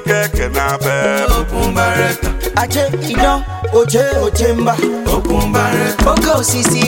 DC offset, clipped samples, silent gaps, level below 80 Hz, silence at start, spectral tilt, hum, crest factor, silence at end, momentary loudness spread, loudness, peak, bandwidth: under 0.1%; under 0.1%; none; -22 dBFS; 0 s; -4.5 dB/octave; none; 14 dB; 0 s; 4 LU; -14 LUFS; 0 dBFS; 17 kHz